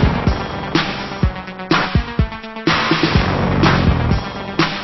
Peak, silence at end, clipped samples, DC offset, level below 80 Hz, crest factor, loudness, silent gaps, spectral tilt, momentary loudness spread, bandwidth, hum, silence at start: 0 dBFS; 0 s; under 0.1%; under 0.1%; -24 dBFS; 16 dB; -17 LUFS; none; -6.5 dB/octave; 8 LU; 6.2 kHz; none; 0 s